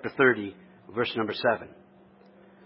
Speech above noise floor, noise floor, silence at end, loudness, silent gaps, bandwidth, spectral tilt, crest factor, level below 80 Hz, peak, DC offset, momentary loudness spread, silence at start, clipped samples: 29 dB; -56 dBFS; 0.95 s; -27 LUFS; none; 5.8 kHz; -9 dB/octave; 22 dB; -68 dBFS; -6 dBFS; under 0.1%; 15 LU; 0.05 s; under 0.1%